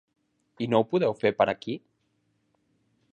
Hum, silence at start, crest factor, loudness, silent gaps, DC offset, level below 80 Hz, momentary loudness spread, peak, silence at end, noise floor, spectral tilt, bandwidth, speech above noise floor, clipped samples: none; 0.6 s; 22 dB; -26 LUFS; none; under 0.1%; -68 dBFS; 12 LU; -6 dBFS; 1.35 s; -73 dBFS; -7.5 dB/octave; 9 kHz; 47 dB; under 0.1%